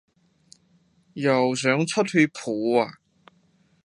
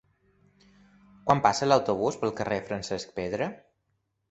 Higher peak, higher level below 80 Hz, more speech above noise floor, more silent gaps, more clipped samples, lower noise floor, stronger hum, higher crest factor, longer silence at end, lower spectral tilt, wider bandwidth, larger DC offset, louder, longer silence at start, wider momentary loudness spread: about the same, -4 dBFS vs -6 dBFS; second, -74 dBFS vs -60 dBFS; second, 41 dB vs 50 dB; neither; neither; second, -63 dBFS vs -77 dBFS; neither; about the same, 20 dB vs 24 dB; first, 0.95 s vs 0.75 s; about the same, -5 dB/octave vs -5 dB/octave; first, 11.5 kHz vs 8.2 kHz; neither; first, -23 LUFS vs -27 LUFS; about the same, 1.15 s vs 1.25 s; second, 6 LU vs 11 LU